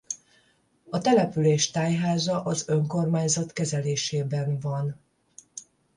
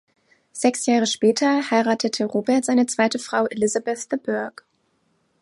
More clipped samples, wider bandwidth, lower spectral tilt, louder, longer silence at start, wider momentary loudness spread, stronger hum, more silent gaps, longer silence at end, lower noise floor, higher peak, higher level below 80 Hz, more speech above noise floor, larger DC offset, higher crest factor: neither; about the same, 11.5 kHz vs 11.5 kHz; first, -5 dB/octave vs -3.5 dB/octave; second, -25 LUFS vs -21 LUFS; second, 0.1 s vs 0.55 s; first, 15 LU vs 8 LU; neither; neither; second, 0.35 s vs 0.9 s; about the same, -65 dBFS vs -67 dBFS; second, -8 dBFS vs -4 dBFS; first, -64 dBFS vs -72 dBFS; second, 40 dB vs 46 dB; neither; about the same, 18 dB vs 18 dB